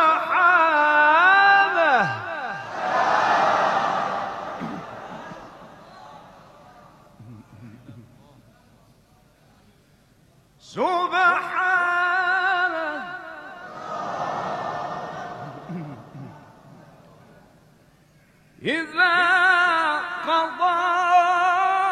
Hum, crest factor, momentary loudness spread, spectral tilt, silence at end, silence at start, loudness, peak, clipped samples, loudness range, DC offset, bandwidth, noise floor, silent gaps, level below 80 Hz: none; 18 dB; 21 LU; -4 dB/octave; 0 s; 0 s; -20 LUFS; -6 dBFS; under 0.1%; 20 LU; under 0.1%; 11 kHz; -57 dBFS; none; -66 dBFS